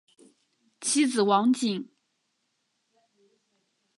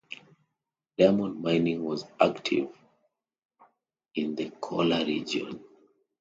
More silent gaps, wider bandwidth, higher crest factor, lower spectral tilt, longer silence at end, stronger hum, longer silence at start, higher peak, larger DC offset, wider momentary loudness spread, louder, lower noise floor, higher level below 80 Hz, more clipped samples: second, none vs 3.45-3.49 s; first, 11.5 kHz vs 8 kHz; about the same, 20 dB vs 24 dB; second, -3.5 dB/octave vs -6 dB/octave; first, 2.15 s vs 0.6 s; neither; first, 0.8 s vs 0.1 s; second, -10 dBFS vs -6 dBFS; neither; second, 12 LU vs 17 LU; first, -25 LUFS vs -28 LUFS; second, -76 dBFS vs -86 dBFS; second, -84 dBFS vs -66 dBFS; neither